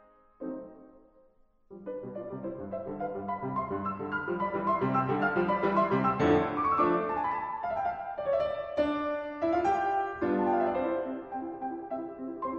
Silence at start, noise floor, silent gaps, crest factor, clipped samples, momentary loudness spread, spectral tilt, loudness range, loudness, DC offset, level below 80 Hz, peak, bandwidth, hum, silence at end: 0.4 s; -63 dBFS; none; 18 dB; under 0.1%; 13 LU; -8 dB/octave; 10 LU; -31 LUFS; under 0.1%; -60 dBFS; -12 dBFS; 7 kHz; none; 0 s